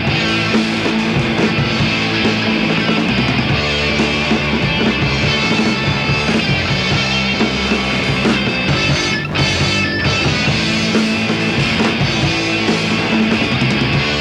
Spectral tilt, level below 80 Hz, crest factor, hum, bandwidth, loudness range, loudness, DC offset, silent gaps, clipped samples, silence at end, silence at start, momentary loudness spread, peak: -5 dB/octave; -34 dBFS; 12 dB; none; 11.5 kHz; 0 LU; -15 LUFS; under 0.1%; none; under 0.1%; 0 s; 0 s; 1 LU; -2 dBFS